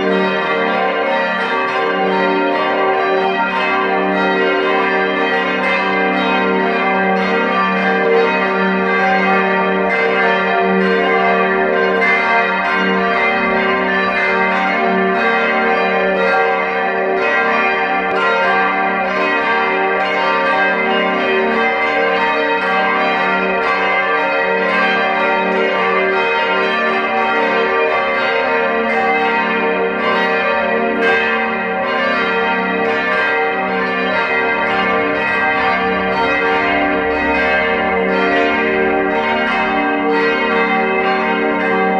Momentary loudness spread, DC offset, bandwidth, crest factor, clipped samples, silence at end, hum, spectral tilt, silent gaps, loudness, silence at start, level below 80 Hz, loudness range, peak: 2 LU; under 0.1%; 8.6 kHz; 14 dB; under 0.1%; 0 s; none; -6 dB/octave; none; -14 LUFS; 0 s; -48 dBFS; 1 LU; -2 dBFS